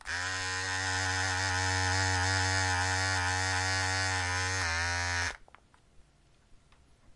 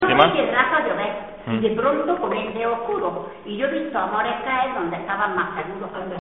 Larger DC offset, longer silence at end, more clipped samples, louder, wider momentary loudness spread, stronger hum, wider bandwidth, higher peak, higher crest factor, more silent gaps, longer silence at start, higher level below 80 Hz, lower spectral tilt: second, under 0.1% vs 0.2%; about the same, 0.05 s vs 0 s; neither; second, -30 LUFS vs -22 LUFS; second, 4 LU vs 12 LU; neither; first, 11.5 kHz vs 4.2 kHz; second, -16 dBFS vs 0 dBFS; second, 16 dB vs 22 dB; neither; about the same, 0.05 s vs 0 s; about the same, -58 dBFS vs -54 dBFS; about the same, -2 dB/octave vs -2.5 dB/octave